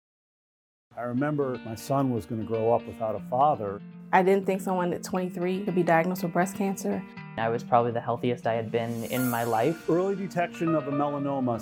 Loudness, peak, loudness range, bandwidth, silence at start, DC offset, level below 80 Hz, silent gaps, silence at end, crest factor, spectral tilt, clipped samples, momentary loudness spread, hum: -27 LUFS; -6 dBFS; 2 LU; 18 kHz; 0.95 s; under 0.1%; -68 dBFS; none; 0 s; 20 dB; -6.5 dB/octave; under 0.1%; 8 LU; none